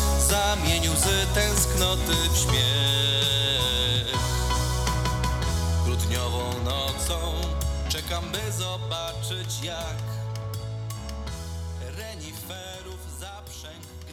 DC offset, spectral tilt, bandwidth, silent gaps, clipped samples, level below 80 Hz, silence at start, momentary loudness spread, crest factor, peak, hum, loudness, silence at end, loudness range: under 0.1%; -3 dB/octave; 18 kHz; none; under 0.1%; -32 dBFS; 0 s; 15 LU; 18 dB; -8 dBFS; none; -25 LUFS; 0 s; 13 LU